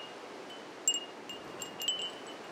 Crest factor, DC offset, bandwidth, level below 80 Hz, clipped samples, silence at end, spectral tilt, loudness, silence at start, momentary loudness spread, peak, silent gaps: 24 dB; under 0.1%; 16.5 kHz; -80 dBFS; under 0.1%; 0 s; 0.5 dB/octave; -36 LUFS; 0 s; 14 LU; -16 dBFS; none